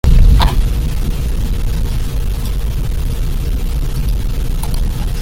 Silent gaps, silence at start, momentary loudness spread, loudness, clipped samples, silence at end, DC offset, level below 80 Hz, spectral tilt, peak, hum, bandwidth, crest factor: none; 0.05 s; 8 LU; -18 LUFS; under 0.1%; 0 s; under 0.1%; -14 dBFS; -6 dB/octave; 0 dBFS; none; 16.5 kHz; 12 dB